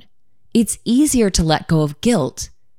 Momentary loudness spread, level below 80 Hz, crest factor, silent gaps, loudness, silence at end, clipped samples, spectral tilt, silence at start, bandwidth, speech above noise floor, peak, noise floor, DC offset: 6 LU; -34 dBFS; 16 dB; none; -17 LUFS; 0.35 s; under 0.1%; -5 dB/octave; 0.55 s; 16.5 kHz; 48 dB; -2 dBFS; -64 dBFS; under 0.1%